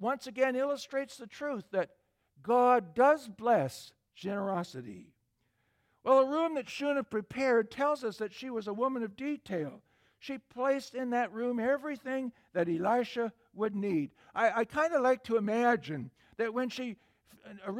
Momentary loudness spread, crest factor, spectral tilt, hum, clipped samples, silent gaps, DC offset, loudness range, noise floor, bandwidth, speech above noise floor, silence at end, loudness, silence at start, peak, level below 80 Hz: 15 LU; 20 dB; -6 dB/octave; none; under 0.1%; none; under 0.1%; 4 LU; -77 dBFS; 15 kHz; 46 dB; 0 s; -32 LUFS; 0 s; -14 dBFS; -74 dBFS